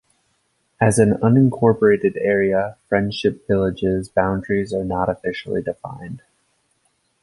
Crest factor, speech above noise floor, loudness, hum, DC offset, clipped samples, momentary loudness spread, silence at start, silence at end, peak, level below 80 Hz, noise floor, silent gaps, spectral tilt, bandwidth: 18 dB; 48 dB; -19 LUFS; none; under 0.1%; under 0.1%; 12 LU; 0.8 s; 1.05 s; 0 dBFS; -46 dBFS; -67 dBFS; none; -6.5 dB/octave; 11.5 kHz